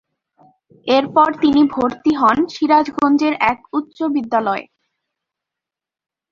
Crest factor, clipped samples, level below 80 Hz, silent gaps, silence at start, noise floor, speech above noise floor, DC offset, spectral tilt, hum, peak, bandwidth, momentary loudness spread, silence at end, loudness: 16 dB; under 0.1%; -54 dBFS; none; 0.85 s; -87 dBFS; 71 dB; under 0.1%; -5.5 dB/octave; none; -2 dBFS; 7.2 kHz; 9 LU; 1.7 s; -16 LUFS